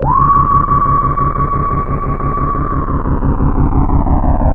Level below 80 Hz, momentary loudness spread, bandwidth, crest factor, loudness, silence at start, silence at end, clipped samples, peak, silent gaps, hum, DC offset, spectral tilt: -16 dBFS; 7 LU; 2.9 kHz; 12 dB; -14 LUFS; 0 s; 0 s; under 0.1%; 0 dBFS; none; none; under 0.1%; -12 dB/octave